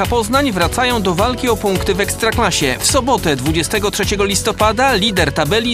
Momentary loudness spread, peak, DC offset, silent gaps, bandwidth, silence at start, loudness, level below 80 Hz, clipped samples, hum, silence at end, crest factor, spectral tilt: 3 LU; 0 dBFS; under 0.1%; none; 15.5 kHz; 0 s; -15 LUFS; -30 dBFS; under 0.1%; none; 0 s; 16 dB; -3.5 dB/octave